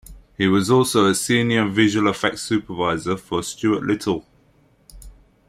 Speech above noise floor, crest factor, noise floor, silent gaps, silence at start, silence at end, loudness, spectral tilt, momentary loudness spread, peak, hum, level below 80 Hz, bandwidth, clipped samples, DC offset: 38 dB; 18 dB; -57 dBFS; none; 0.1 s; 0.4 s; -20 LUFS; -4.5 dB/octave; 8 LU; -4 dBFS; none; -50 dBFS; 16 kHz; under 0.1%; under 0.1%